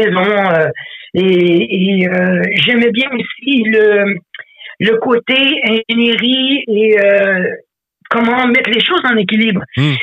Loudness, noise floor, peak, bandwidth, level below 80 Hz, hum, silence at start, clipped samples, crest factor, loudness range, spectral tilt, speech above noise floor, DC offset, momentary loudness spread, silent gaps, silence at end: -12 LUFS; -33 dBFS; 0 dBFS; 8 kHz; -58 dBFS; none; 0 s; under 0.1%; 12 dB; 1 LU; -7 dB/octave; 21 dB; under 0.1%; 8 LU; none; 0 s